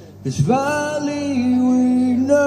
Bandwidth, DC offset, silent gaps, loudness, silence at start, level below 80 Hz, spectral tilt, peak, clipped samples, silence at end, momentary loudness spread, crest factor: 10 kHz; under 0.1%; none; -18 LUFS; 0 s; -52 dBFS; -6.5 dB/octave; -4 dBFS; under 0.1%; 0 s; 6 LU; 14 dB